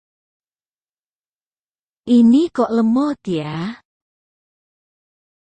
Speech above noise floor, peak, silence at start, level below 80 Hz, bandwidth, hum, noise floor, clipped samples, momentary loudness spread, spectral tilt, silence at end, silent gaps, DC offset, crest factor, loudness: over 75 dB; -4 dBFS; 2.05 s; -62 dBFS; 8.6 kHz; none; under -90 dBFS; under 0.1%; 15 LU; -7.5 dB/octave; 1.7 s; none; under 0.1%; 16 dB; -16 LUFS